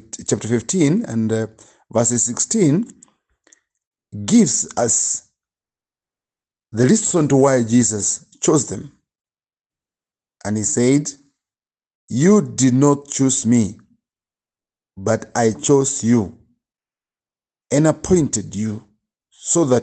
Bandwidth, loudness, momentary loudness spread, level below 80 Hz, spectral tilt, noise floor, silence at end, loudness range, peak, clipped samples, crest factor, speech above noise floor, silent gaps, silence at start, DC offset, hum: 9.4 kHz; -17 LUFS; 12 LU; -54 dBFS; -5 dB/octave; under -90 dBFS; 0 s; 4 LU; -2 dBFS; under 0.1%; 18 dB; over 73 dB; 3.87-3.91 s, 9.66-9.70 s, 11.95-12.08 s; 0.15 s; under 0.1%; none